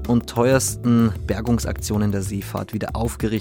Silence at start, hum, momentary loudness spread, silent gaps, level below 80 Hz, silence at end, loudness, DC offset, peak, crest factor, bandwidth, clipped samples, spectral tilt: 0 s; none; 9 LU; none; -36 dBFS; 0 s; -21 LUFS; under 0.1%; -4 dBFS; 16 dB; 17 kHz; under 0.1%; -6 dB/octave